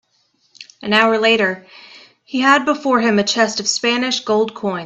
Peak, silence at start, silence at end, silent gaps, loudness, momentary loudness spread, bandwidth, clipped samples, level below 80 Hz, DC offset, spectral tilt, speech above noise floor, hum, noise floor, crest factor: 0 dBFS; 0.6 s; 0 s; none; -16 LUFS; 7 LU; 8.4 kHz; under 0.1%; -62 dBFS; under 0.1%; -3 dB/octave; 46 dB; none; -62 dBFS; 18 dB